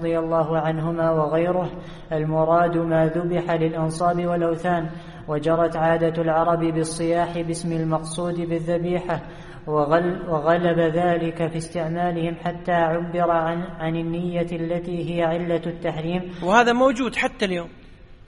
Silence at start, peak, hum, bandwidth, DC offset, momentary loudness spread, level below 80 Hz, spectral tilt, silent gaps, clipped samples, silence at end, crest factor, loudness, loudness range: 0 s; -2 dBFS; none; 11.5 kHz; under 0.1%; 8 LU; -46 dBFS; -6.5 dB/octave; none; under 0.1%; 0.1 s; 20 dB; -22 LUFS; 2 LU